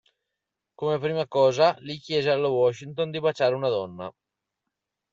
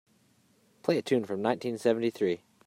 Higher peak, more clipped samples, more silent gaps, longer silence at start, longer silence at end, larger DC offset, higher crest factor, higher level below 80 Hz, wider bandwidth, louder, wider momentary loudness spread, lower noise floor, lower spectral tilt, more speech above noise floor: about the same, -8 dBFS vs -10 dBFS; neither; neither; about the same, 0.8 s vs 0.85 s; first, 1.05 s vs 0.3 s; neither; about the same, 18 dB vs 20 dB; first, -70 dBFS vs -78 dBFS; second, 7.6 kHz vs 16 kHz; first, -24 LUFS vs -30 LUFS; first, 12 LU vs 4 LU; first, -85 dBFS vs -66 dBFS; about the same, -5.5 dB/octave vs -6 dB/octave; first, 60 dB vs 38 dB